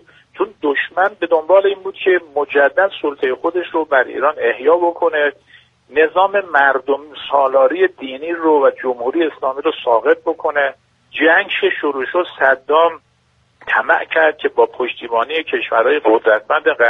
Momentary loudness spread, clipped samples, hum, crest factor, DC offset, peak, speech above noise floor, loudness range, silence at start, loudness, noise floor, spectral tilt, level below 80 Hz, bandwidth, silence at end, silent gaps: 7 LU; under 0.1%; none; 16 dB; under 0.1%; 0 dBFS; 43 dB; 1 LU; 0.35 s; -16 LUFS; -58 dBFS; -5.5 dB/octave; -62 dBFS; 4.1 kHz; 0 s; none